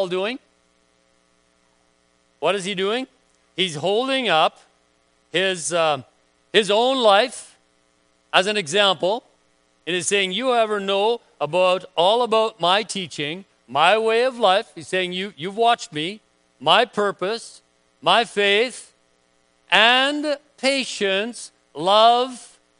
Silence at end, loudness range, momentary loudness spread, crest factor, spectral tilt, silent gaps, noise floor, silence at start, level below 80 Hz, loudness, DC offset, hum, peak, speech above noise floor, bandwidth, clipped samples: 0.35 s; 4 LU; 12 LU; 22 dB; -2.5 dB/octave; none; -63 dBFS; 0 s; -74 dBFS; -20 LUFS; under 0.1%; none; 0 dBFS; 43 dB; 10.5 kHz; under 0.1%